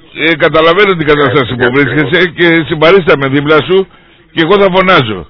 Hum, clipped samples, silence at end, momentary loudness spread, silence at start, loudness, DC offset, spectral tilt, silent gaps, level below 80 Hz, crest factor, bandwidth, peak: none; 2%; 0.05 s; 5 LU; 0.15 s; -8 LUFS; under 0.1%; -7.5 dB/octave; none; -36 dBFS; 8 dB; 5.4 kHz; 0 dBFS